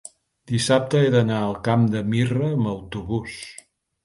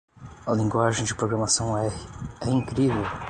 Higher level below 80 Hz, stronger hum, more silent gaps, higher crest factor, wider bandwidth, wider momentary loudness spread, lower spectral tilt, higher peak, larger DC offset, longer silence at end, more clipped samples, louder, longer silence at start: about the same, -50 dBFS vs -46 dBFS; neither; neither; about the same, 18 dB vs 18 dB; about the same, 11.5 kHz vs 11 kHz; about the same, 12 LU vs 11 LU; first, -6 dB/octave vs -4.5 dB/octave; about the same, -4 dBFS vs -6 dBFS; neither; first, 0.5 s vs 0 s; neither; first, -22 LUFS vs -25 LUFS; first, 0.5 s vs 0.2 s